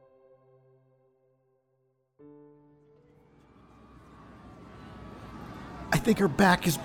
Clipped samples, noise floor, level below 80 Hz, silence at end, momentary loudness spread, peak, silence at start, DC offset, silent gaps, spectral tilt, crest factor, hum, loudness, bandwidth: under 0.1%; -74 dBFS; -54 dBFS; 0 s; 28 LU; -10 dBFS; 4.45 s; under 0.1%; none; -5 dB/octave; 24 dB; none; -25 LUFS; 18 kHz